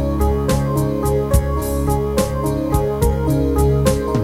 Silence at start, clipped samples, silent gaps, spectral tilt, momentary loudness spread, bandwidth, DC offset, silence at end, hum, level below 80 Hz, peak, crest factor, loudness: 0 s; under 0.1%; none; -7 dB/octave; 3 LU; 16.5 kHz; 0.1%; 0 s; none; -22 dBFS; -2 dBFS; 16 dB; -18 LUFS